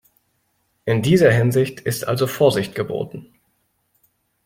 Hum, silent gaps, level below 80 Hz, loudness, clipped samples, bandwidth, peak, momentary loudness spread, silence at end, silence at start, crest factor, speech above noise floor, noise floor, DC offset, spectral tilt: none; none; -54 dBFS; -19 LUFS; under 0.1%; 16.5 kHz; -2 dBFS; 15 LU; 1.2 s; 0.85 s; 18 dB; 50 dB; -68 dBFS; under 0.1%; -6 dB/octave